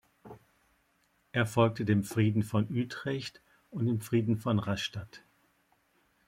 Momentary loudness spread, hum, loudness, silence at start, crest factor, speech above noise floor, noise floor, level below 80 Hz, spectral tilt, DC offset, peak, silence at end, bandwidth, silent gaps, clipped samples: 11 LU; none; -31 LUFS; 0.25 s; 22 dB; 42 dB; -72 dBFS; -66 dBFS; -6.5 dB/octave; under 0.1%; -12 dBFS; 1.1 s; 16 kHz; none; under 0.1%